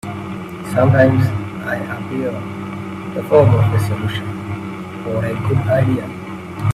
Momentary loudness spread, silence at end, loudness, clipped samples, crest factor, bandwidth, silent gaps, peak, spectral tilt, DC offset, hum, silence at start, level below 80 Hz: 15 LU; 0 s; -18 LUFS; under 0.1%; 16 dB; 14 kHz; none; 0 dBFS; -8 dB/octave; under 0.1%; none; 0.05 s; -44 dBFS